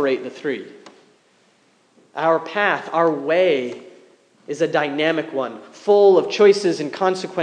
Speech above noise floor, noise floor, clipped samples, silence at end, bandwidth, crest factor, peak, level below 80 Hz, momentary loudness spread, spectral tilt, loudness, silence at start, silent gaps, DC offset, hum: 40 dB; -58 dBFS; under 0.1%; 0 s; 9.6 kHz; 16 dB; -2 dBFS; -86 dBFS; 16 LU; -5 dB/octave; -19 LUFS; 0 s; none; under 0.1%; none